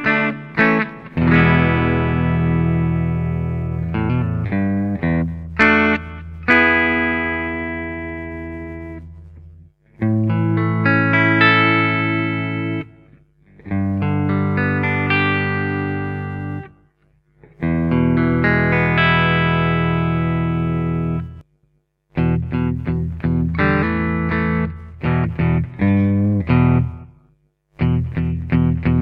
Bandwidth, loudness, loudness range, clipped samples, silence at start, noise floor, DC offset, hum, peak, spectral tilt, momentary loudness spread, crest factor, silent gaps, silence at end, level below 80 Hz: 5.6 kHz; -18 LUFS; 5 LU; under 0.1%; 0 s; -64 dBFS; under 0.1%; none; 0 dBFS; -9 dB/octave; 12 LU; 18 dB; none; 0 s; -34 dBFS